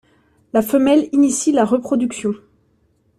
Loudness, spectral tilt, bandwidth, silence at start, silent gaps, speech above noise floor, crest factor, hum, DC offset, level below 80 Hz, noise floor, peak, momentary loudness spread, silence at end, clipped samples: -17 LUFS; -4.5 dB/octave; 14.5 kHz; 0.55 s; none; 45 dB; 16 dB; none; under 0.1%; -58 dBFS; -60 dBFS; -2 dBFS; 10 LU; 0.8 s; under 0.1%